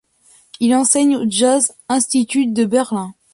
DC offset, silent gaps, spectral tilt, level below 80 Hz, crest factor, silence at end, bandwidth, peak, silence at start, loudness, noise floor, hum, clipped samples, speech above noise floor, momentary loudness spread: under 0.1%; none; -3 dB/octave; -62 dBFS; 16 dB; 0.2 s; 11.5 kHz; 0 dBFS; 0.6 s; -16 LUFS; -52 dBFS; none; under 0.1%; 37 dB; 6 LU